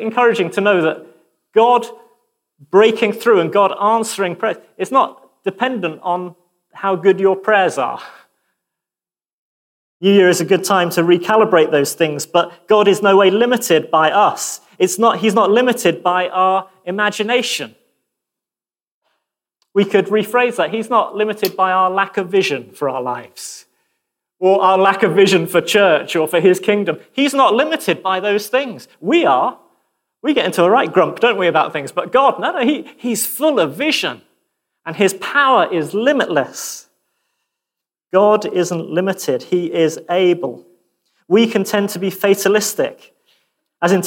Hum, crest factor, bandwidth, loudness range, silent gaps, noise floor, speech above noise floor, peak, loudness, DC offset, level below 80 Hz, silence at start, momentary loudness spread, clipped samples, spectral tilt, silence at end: none; 14 dB; 17 kHz; 5 LU; 9.33-10.00 s, 18.92-19.02 s; under -90 dBFS; over 75 dB; -2 dBFS; -15 LUFS; under 0.1%; -70 dBFS; 0 s; 10 LU; under 0.1%; -4 dB/octave; 0 s